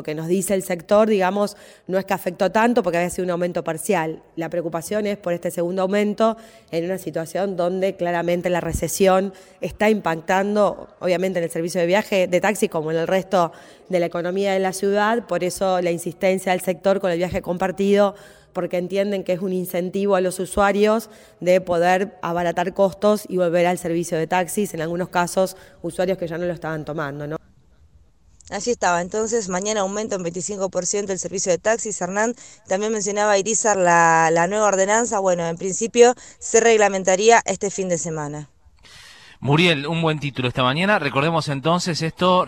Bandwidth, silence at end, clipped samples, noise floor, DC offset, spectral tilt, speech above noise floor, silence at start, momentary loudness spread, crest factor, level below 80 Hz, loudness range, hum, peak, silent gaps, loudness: 19.5 kHz; 0 s; under 0.1%; -54 dBFS; under 0.1%; -4.5 dB/octave; 34 dB; 0 s; 9 LU; 20 dB; -50 dBFS; 6 LU; none; 0 dBFS; none; -21 LUFS